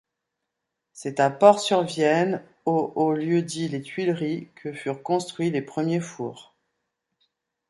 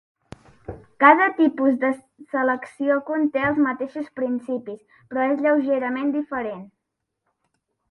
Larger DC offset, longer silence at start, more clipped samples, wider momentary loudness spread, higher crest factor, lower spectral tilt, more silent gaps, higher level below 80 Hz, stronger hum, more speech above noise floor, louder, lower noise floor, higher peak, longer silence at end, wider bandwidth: neither; first, 0.95 s vs 0.7 s; neither; second, 15 LU vs 20 LU; about the same, 24 dB vs 22 dB; second, -5.5 dB/octave vs -7 dB/octave; neither; second, -72 dBFS vs -60 dBFS; neither; about the same, 59 dB vs 59 dB; second, -24 LUFS vs -21 LUFS; about the same, -82 dBFS vs -80 dBFS; about the same, -2 dBFS vs 0 dBFS; about the same, 1.25 s vs 1.25 s; about the same, 11.5 kHz vs 10.5 kHz